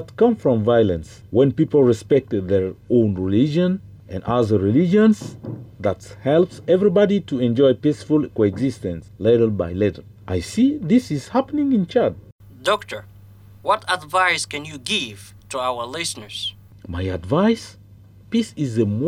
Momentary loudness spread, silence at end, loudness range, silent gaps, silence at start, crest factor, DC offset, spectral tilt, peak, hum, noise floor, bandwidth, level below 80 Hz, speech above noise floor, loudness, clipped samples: 12 LU; 0 s; 5 LU; 12.32-12.39 s; 0 s; 14 dB; under 0.1%; -6 dB/octave; -6 dBFS; none; -46 dBFS; 15 kHz; -50 dBFS; 27 dB; -20 LUFS; under 0.1%